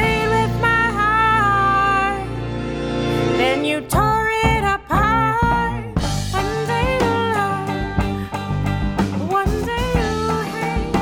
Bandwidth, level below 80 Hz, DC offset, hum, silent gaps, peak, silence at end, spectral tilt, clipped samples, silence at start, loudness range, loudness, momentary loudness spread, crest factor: 18 kHz; -30 dBFS; under 0.1%; none; none; -2 dBFS; 0 s; -5.5 dB/octave; under 0.1%; 0 s; 3 LU; -19 LUFS; 7 LU; 16 dB